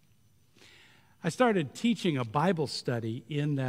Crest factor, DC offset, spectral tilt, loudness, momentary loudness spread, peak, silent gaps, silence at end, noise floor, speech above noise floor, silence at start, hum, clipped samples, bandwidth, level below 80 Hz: 20 dB; under 0.1%; -6 dB/octave; -30 LUFS; 8 LU; -12 dBFS; none; 0 s; -66 dBFS; 37 dB; 1.25 s; none; under 0.1%; 15.5 kHz; -72 dBFS